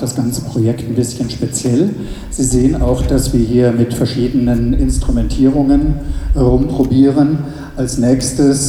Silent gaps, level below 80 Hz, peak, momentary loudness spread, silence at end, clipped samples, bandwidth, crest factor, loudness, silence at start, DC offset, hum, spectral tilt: none; -22 dBFS; 0 dBFS; 8 LU; 0 s; under 0.1%; 15.5 kHz; 12 dB; -14 LUFS; 0 s; under 0.1%; none; -6.5 dB/octave